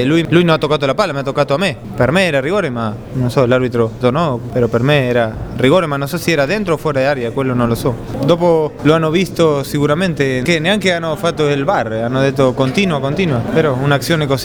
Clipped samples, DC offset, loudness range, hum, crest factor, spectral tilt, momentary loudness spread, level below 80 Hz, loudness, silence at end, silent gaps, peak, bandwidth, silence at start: under 0.1%; under 0.1%; 1 LU; none; 14 dB; -6 dB/octave; 5 LU; -38 dBFS; -15 LUFS; 0 s; none; 0 dBFS; over 20 kHz; 0 s